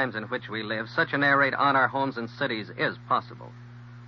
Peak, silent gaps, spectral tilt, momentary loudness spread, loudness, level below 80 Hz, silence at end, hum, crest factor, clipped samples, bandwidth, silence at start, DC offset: -10 dBFS; none; -7 dB/octave; 23 LU; -26 LUFS; -66 dBFS; 0 s; 60 Hz at -45 dBFS; 18 dB; under 0.1%; 6.4 kHz; 0 s; under 0.1%